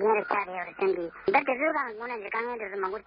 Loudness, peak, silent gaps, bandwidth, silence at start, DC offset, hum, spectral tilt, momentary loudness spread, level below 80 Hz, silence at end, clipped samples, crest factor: -29 LUFS; -8 dBFS; none; 5.4 kHz; 0 s; under 0.1%; none; -9 dB/octave; 8 LU; -68 dBFS; 0.05 s; under 0.1%; 20 dB